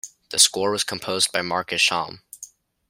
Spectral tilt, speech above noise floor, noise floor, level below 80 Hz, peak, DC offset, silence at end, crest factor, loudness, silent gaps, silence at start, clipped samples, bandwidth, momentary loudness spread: -0.5 dB/octave; 24 dB; -46 dBFS; -66 dBFS; 0 dBFS; under 0.1%; 0.45 s; 24 dB; -20 LUFS; none; 0.05 s; under 0.1%; 16.5 kHz; 21 LU